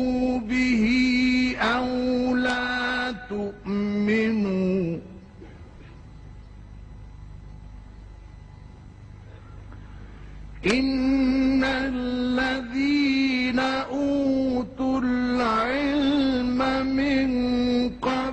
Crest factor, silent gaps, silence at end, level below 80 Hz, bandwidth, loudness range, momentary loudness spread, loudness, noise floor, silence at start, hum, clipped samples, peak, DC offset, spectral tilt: 18 dB; none; 0 s; -44 dBFS; 8.8 kHz; 22 LU; 23 LU; -23 LUFS; -44 dBFS; 0 s; none; under 0.1%; -6 dBFS; under 0.1%; -5.5 dB/octave